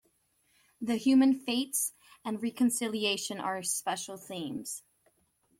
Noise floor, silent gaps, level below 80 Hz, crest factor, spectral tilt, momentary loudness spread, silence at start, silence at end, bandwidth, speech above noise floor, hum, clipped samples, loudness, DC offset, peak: -72 dBFS; none; -74 dBFS; 16 dB; -2.5 dB/octave; 15 LU; 0.8 s; 0.8 s; 16.5 kHz; 42 dB; none; under 0.1%; -31 LUFS; under 0.1%; -14 dBFS